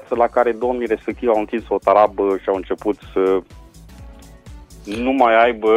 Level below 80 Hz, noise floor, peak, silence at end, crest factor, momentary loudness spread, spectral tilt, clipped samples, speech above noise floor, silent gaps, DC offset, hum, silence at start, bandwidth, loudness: -44 dBFS; -40 dBFS; 0 dBFS; 0 s; 18 dB; 9 LU; -6 dB/octave; under 0.1%; 23 dB; none; under 0.1%; none; 0.1 s; 12.5 kHz; -18 LUFS